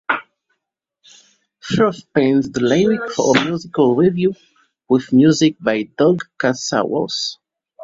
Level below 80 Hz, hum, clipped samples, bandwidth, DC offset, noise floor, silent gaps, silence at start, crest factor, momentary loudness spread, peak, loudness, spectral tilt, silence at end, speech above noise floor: -56 dBFS; none; under 0.1%; 7.8 kHz; under 0.1%; -78 dBFS; none; 0.1 s; 16 dB; 9 LU; -2 dBFS; -17 LUFS; -5.5 dB/octave; 0 s; 62 dB